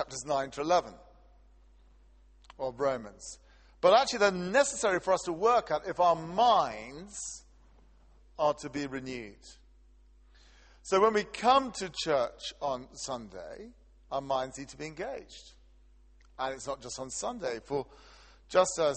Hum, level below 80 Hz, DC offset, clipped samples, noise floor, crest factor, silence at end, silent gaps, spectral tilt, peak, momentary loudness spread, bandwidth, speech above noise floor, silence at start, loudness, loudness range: none; -58 dBFS; under 0.1%; under 0.1%; -59 dBFS; 22 dB; 0 s; none; -3 dB/octave; -10 dBFS; 19 LU; 8.8 kHz; 29 dB; 0 s; -30 LUFS; 11 LU